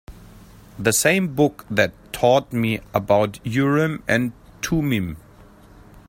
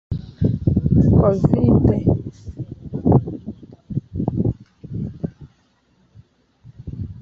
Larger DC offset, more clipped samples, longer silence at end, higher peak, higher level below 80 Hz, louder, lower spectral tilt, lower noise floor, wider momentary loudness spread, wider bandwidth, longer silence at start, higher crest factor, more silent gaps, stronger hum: neither; neither; about the same, 0.1 s vs 0 s; about the same, -2 dBFS vs 0 dBFS; second, -46 dBFS vs -32 dBFS; about the same, -21 LUFS vs -19 LUFS; second, -5 dB/octave vs -11.5 dB/octave; second, -47 dBFS vs -60 dBFS; second, 7 LU vs 19 LU; first, 16.5 kHz vs 6.6 kHz; about the same, 0.1 s vs 0.1 s; about the same, 20 dB vs 20 dB; neither; neither